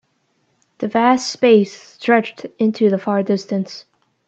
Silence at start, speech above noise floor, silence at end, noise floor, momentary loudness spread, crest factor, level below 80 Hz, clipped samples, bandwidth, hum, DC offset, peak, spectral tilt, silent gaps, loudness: 0.8 s; 48 dB; 0.45 s; -65 dBFS; 14 LU; 18 dB; -68 dBFS; under 0.1%; 8.2 kHz; none; under 0.1%; 0 dBFS; -5.5 dB/octave; none; -17 LUFS